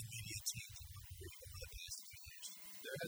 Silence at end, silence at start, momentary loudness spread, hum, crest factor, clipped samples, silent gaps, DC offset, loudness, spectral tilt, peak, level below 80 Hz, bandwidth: 0 s; 0 s; 10 LU; none; 24 dB; under 0.1%; none; under 0.1%; -49 LUFS; -2 dB/octave; -26 dBFS; -62 dBFS; over 20 kHz